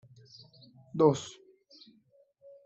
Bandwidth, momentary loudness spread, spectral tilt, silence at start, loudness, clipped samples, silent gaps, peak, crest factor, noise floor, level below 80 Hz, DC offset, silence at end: 8.2 kHz; 27 LU; -6.5 dB/octave; 0.95 s; -28 LUFS; under 0.1%; none; -10 dBFS; 24 dB; -66 dBFS; -74 dBFS; under 0.1%; 1.35 s